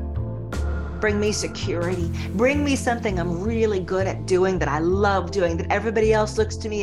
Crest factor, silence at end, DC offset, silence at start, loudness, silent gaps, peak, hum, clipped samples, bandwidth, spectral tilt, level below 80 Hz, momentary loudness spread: 16 dB; 0 s; 0.5%; 0 s; -23 LUFS; none; -6 dBFS; none; under 0.1%; 12.5 kHz; -5.5 dB/octave; -36 dBFS; 7 LU